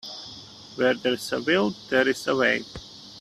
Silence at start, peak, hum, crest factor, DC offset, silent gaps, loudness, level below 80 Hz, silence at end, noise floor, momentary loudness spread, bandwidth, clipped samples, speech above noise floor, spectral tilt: 0.05 s; -6 dBFS; none; 18 dB; under 0.1%; none; -24 LUFS; -60 dBFS; 0 s; -44 dBFS; 18 LU; 14.5 kHz; under 0.1%; 20 dB; -4 dB/octave